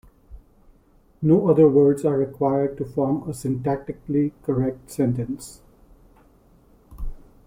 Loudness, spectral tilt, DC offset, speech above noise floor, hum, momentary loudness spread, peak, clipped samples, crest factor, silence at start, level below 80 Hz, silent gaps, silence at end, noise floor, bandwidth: -22 LUFS; -9 dB/octave; under 0.1%; 36 dB; none; 19 LU; -6 dBFS; under 0.1%; 18 dB; 0.3 s; -44 dBFS; none; 0.3 s; -56 dBFS; 16 kHz